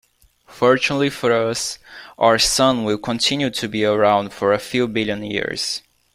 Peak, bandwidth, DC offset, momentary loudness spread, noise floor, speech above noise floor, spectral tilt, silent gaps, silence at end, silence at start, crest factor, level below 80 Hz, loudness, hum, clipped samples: -2 dBFS; 16 kHz; under 0.1%; 9 LU; -52 dBFS; 33 dB; -3.5 dB/octave; none; 0.35 s; 0.5 s; 18 dB; -48 dBFS; -19 LUFS; none; under 0.1%